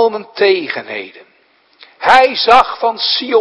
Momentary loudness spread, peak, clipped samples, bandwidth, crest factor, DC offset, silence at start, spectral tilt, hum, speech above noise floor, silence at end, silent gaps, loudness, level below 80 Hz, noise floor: 15 LU; 0 dBFS; 0.5%; 11 kHz; 14 dB; under 0.1%; 0 s; -3 dB/octave; none; 41 dB; 0 s; none; -12 LUFS; -50 dBFS; -53 dBFS